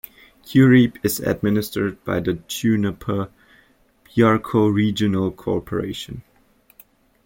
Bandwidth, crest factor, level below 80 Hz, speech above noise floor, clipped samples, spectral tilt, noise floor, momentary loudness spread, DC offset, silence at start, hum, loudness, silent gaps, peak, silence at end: 17 kHz; 18 dB; -50 dBFS; 38 dB; under 0.1%; -6.5 dB/octave; -57 dBFS; 13 LU; under 0.1%; 0.45 s; none; -20 LUFS; none; -2 dBFS; 1.05 s